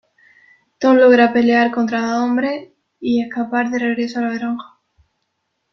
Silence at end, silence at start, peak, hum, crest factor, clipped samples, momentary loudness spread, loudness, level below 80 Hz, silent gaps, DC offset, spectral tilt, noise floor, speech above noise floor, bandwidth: 1.05 s; 0.8 s; -2 dBFS; none; 16 dB; under 0.1%; 13 LU; -16 LUFS; -64 dBFS; none; under 0.1%; -5.5 dB/octave; -72 dBFS; 56 dB; 6.6 kHz